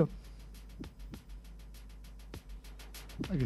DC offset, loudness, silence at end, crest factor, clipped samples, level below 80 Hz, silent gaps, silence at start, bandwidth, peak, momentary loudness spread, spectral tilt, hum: under 0.1%; -46 LUFS; 0 s; 26 dB; under 0.1%; -48 dBFS; none; 0 s; 13.5 kHz; -14 dBFS; 12 LU; -7 dB/octave; none